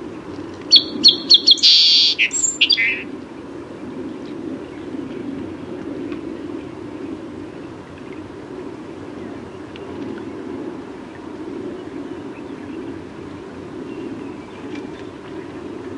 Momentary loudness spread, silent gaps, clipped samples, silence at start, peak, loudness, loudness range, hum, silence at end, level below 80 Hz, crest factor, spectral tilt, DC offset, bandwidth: 24 LU; none; under 0.1%; 0 s; 0 dBFS; -12 LUFS; 20 LU; none; 0 s; -56 dBFS; 22 dB; -1.5 dB/octave; under 0.1%; 11.5 kHz